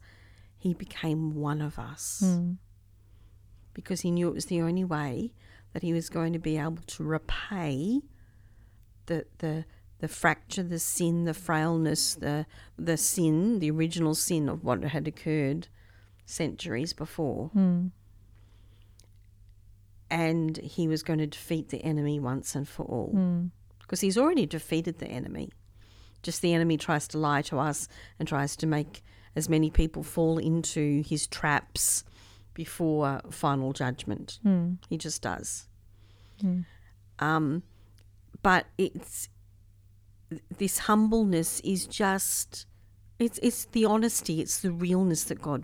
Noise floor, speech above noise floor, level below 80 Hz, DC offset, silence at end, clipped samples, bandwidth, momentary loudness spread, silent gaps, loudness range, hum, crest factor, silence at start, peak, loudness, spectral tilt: -56 dBFS; 28 dB; -48 dBFS; under 0.1%; 0 s; under 0.1%; 17 kHz; 11 LU; none; 5 LU; none; 22 dB; 0.65 s; -8 dBFS; -29 LUFS; -5 dB/octave